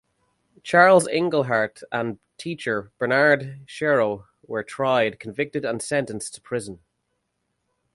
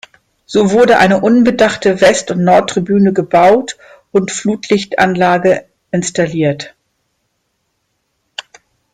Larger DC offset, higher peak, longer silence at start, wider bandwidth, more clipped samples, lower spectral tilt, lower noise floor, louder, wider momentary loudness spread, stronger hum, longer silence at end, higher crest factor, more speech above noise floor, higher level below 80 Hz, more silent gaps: neither; about the same, -2 dBFS vs 0 dBFS; first, 0.65 s vs 0.5 s; about the same, 11.5 kHz vs 12 kHz; neither; about the same, -4.5 dB/octave vs -5 dB/octave; first, -75 dBFS vs -67 dBFS; second, -22 LUFS vs -12 LUFS; about the same, 16 LU vs 16 LU; neither; first, 1.2 s vs 0.55 s; first, 22 dB vs 12 dB; about the same, 53 dB vs 55 dB; second, -64 dBFS vs -50 dBFS; neither